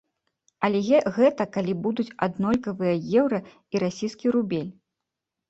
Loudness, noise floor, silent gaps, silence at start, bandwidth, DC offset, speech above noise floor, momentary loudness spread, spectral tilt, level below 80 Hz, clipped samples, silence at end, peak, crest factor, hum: -25 LUFS; -85 dBFS; none; 0.6 s; 8 kHz; under 0.1%; 61 dB; 8 LU; -7 dB/octave; -62 dBFS; under 0.1%; 0.8 s; -6 dBFS; 20 dB; none